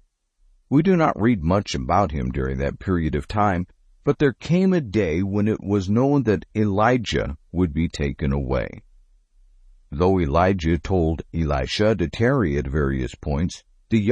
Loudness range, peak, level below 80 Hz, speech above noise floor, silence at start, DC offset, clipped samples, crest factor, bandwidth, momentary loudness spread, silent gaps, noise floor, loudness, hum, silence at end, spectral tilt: 3 LU; -6 dBFS; -34 dBFS; 40 dB; 0.7 s; under 0.1%; under 0.1%; 16 dB; 9.6 kHz; 7 LU; none; -61 dBFS; -22 LUFS; none; 0 s; -7 dB/octave